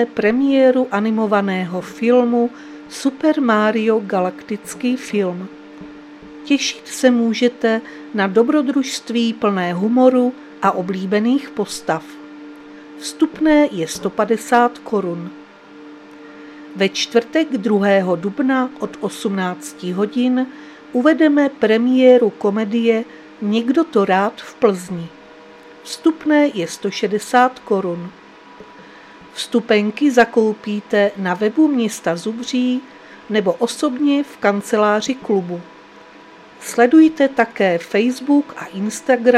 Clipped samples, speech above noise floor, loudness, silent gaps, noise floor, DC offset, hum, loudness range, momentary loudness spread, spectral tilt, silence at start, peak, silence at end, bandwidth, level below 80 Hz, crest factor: under 0.1%; 25 dB; -17 LUFS; none; -42 dBFS; under 0.1%; none; 4 LU; 15 LU; -5 dB/octave; 0 s; 0 dBFS; 0 s; 14.5 kHz; -60 dBFS; 18 dB